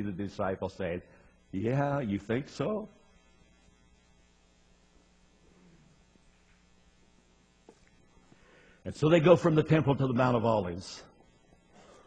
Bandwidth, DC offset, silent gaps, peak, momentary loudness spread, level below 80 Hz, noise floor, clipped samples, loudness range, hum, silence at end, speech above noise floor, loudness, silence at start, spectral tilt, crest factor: 9.2 kHz; under 0.1%; none; -6 dBFS; 18 LU; -60 dBFS; -64 dBFS; under 0.1%; 13 LU; none; 1.05 s; 36 dB; -29 LUFS; 0 s; -7.5 dB/octave; 26 dB